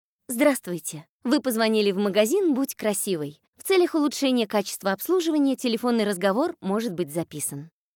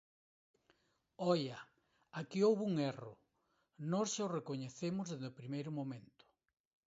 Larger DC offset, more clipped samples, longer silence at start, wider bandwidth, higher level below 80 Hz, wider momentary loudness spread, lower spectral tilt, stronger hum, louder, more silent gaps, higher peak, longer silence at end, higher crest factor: neither; neither; second, 0.3 s vs 1.2 s; first, 18.5 kHz vs 7.6 kHz; first, -76 dBFS vs -82 dBFS; second, 10 LU vs 16 LU; second, -4 dB/octave vs -6 dB/octave; neither; first, -24 LUFS vs -39 LUFS; first, 1.09-1.20 s, 3.48-3.53 s vs none; first, -8 dBFS vs -22 dBFS; second, 0.3 s vs 0.8 s; about the same, 16 dB vs 18 dB